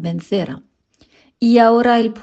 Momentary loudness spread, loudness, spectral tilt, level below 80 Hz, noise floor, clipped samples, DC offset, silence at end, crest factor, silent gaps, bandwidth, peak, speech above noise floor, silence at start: 15 LU; -15 LUFS; -7 dB/octave; -58 dBFS; -56 dBFS; under 0.1%; under 0.1%; 0 s; 16 dB; none; 7.8 kHz; 0 dBFS; 41 dB; 0 s